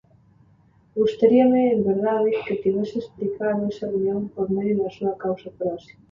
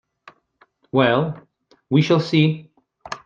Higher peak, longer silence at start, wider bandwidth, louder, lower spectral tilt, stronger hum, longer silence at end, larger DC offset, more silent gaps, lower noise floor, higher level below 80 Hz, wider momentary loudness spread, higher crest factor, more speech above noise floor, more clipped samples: about the same, -4 dBFS vs -2 dBFS; about the same, 0.95 s vs 0.95 s; about the same, 7 kHz vs 7.2 kHz; second, -22 LUFS vs -19 LUFS; first, -8.5 dB/octave vs -7 dB/octave; neither; first, 0.3 s vs 0.1 s; neither; neither; about the same, -57 dBFS vs -60 dBFS; about the same, -60 dBFS vs -62 dBFS; second, 12 LU vs 16 LU; about the same, 18 dB vs 18 dB; second, 35 dB vs 42 dB; neither